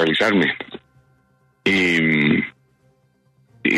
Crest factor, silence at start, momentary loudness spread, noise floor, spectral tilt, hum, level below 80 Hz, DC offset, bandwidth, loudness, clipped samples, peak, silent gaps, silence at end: 16 dB; 0 s; 14 LU; -61 dBFS; -5.5 dB/octave; none; -58 dBFS; under 0.1%; 13 kHz; -18 LUFS; under 0.1%; -6 dBFS; none; 0 s